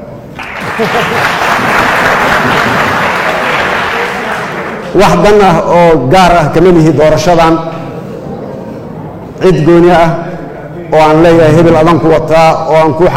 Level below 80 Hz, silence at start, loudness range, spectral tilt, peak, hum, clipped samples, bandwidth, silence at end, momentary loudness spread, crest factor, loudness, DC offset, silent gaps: -28 dBFS; 0 s; 4 LU; -6 dB/octave; 0 dBFS; none; 1%; 16.5 kHz; 0 s; 17 LU; 8 dB; -7 LUFS; under 0.1%; none